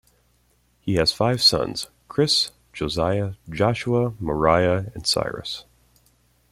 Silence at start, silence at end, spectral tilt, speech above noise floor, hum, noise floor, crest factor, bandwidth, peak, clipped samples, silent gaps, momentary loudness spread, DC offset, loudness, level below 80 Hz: 0.85 s; 0.9 s; -4.5 dB/octave; 41 dB; none; -63 dBFS; 20 dB; 16 kHz; -4 dBFS; under 0.1%; none; 13 LU; under 0.1%; -22 LUFS; -46 dBFS